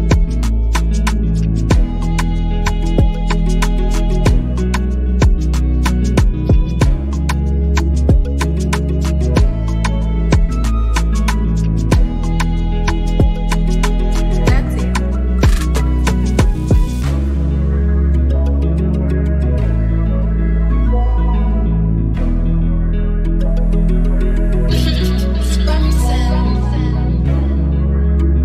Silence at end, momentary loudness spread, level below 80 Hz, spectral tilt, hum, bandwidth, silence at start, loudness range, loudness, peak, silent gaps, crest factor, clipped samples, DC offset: 0 s; 3 LU; -14 dBFS; -6.5 dB/octave; none; 13 kHz; 0 s; 1 LU; -16 LUFS; -2 dBFS; none; 12 dB; under 0.1%; under 0.1%